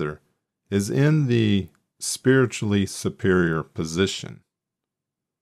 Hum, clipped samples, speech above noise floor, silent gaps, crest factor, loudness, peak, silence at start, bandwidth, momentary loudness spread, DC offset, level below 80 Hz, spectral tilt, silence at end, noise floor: none; under 0.1%; 64 dB; none; 18 dB; -23 LUFS; -6 dBFS; 0 s; 14 kHz; 12 LU; under 0.1%; -56 dBFS; -5.5 dB/octave; 1.1 s; -85 dBFS